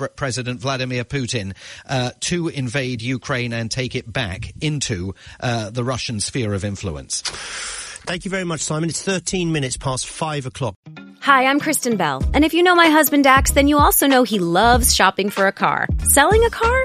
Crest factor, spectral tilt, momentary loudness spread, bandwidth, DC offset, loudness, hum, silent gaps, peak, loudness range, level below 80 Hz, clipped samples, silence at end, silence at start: 18 dB; -4 dB/octave; 13 LU; 15 kHz; under 0.1%; -18 LUFS; none; 10.76-10.83 s; 0 dBFS; 10 LU; -32 dBFS; under 0.1%; 0 s; 0 s